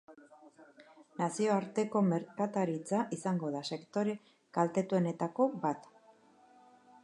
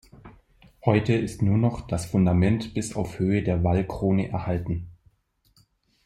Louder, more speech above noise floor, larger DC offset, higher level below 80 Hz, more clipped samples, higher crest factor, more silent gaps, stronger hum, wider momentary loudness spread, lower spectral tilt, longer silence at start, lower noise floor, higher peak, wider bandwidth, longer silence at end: second, -34 LUFS vs -25 LUFS; second, 30 dB vs 42 dB; neither; second, -84 dBFS vs -46 dBFS; neither; about the same, 20 dB vs 20 dB; neither; neither; about the same, 7 LU vs 9 LU; about the same, -6.5 dB/octave vs -7.5 dB/octave; second, 0.1 s vs 0.25 s; about the same, -63 dBFS vs -66 dBFS; second, -16 dBFS vs -4 dBFS; second, 11 kHz vs 13.5 kHz; about the same, 1.2 s vs 1.15 s